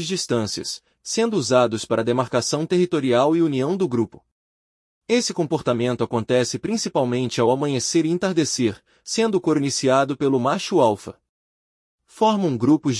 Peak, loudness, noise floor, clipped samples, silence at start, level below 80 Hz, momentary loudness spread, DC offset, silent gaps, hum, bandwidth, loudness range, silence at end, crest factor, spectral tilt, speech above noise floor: -4 dBFS; -21 LUFS; under -90 dBFS; under 0.1%; 0 s; -62 dBFS; 6 LU; under 0.1%; 4.32-5.02 s, 11.29-11.98 s; none; 12 kHz; 2 LU; 0 s; 16 dB; -5 dB/octave; over 69 dB